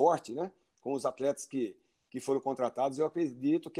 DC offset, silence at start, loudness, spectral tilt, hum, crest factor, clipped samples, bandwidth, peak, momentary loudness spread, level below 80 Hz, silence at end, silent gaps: under 0.1%; 0 s; -34 LUFS; -6 dB/octave; none; 20 dB; under 0.1%; 14.5 kHz; -14 dBFS; 9 LU; -80 dBFS; 0 s; none